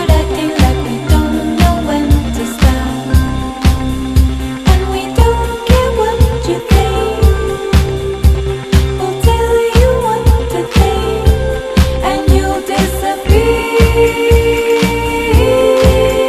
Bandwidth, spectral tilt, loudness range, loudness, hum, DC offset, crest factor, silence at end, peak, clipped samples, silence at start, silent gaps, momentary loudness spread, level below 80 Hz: 14.5 kHz; -6 dB/octave; 2 LU; -12 LUFS; none; 0.1%; 10 dB; 0 s; 0 dBFS; 0.2%; 0 s; none; 5 LU; -14 dBFS